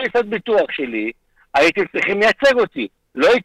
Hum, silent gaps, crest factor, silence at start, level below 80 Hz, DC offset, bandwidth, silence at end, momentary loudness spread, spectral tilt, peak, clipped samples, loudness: none; none; 14 dB; 0 s; -54 dBFS; under 0.1%; 13.5 kHz; 0 s; 11 LU; -4 dB/octave; -2 dBFS; under 0.1%; -17 LUFS